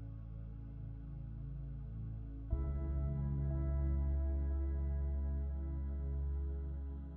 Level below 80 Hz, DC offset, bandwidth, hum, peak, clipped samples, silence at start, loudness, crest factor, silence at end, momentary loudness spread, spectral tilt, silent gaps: -40 dBFS; under 0.1%; 2.1 kHz; none; -24 dBFS; under 0.1%; 0 s; -41 LUFS; 14 dB; 0 s; 11 LU; -12 dB/octave; none